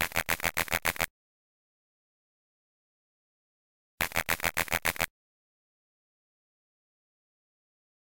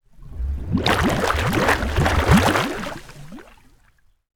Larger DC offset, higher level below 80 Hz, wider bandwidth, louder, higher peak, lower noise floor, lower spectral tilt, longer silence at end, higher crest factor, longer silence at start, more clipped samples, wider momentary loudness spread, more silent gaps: first, 0.2% vs under 0.1%; second, -52 dBFS vs -30 dBFS; second, 17.5 kHz vs 20 kHz; second, -30 LUFS vs -20 LUFS; second, -8 dBFS vs -2 dBFS; first, under -90 dBFS vs -57 dBFS; second, -1.5 dB/octave vs -5 dB/octave; first, 2.95 s vs 0.9 s; first, 28 dB vs 20 dB; second, 0 s vs 0.2 s; neither; second, 5 LU vs 21 LU; first, 1.10-3.98 s vs none